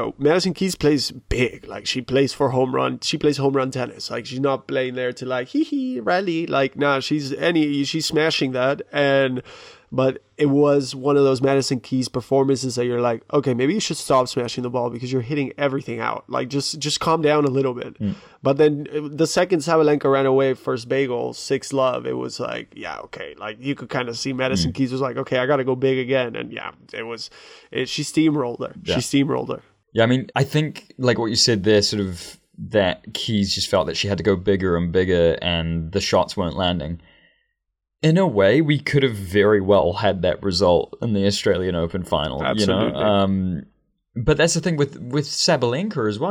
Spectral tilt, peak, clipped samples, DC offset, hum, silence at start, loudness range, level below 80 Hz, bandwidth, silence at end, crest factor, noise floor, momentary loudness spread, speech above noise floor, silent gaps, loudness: -5 dB/octave; -4 dBFS; under 0.1%; under 0.1%; none; 0 s; 4 LU; -46 dBFS; 16 kHz; 0 s; 16 dB; -78 dBFS; 10 LU; 58 dB; none; -21 LUFS